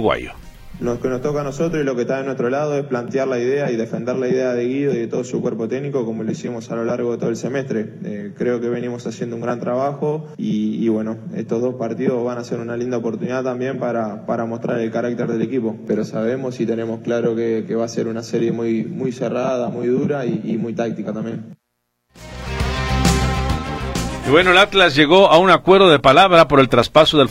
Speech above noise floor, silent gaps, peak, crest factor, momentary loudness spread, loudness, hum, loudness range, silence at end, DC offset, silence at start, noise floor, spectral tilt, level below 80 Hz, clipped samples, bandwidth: 54 dB; none; 0 dBFS; 18 dB; 14 LU; -18 LUFS; none; 10 LU; 0 s; under 0.1%; 0 s; -72 dBFS; -5.5 dB/octave; -36 dBFS; under 0.1%; 15.5 kHz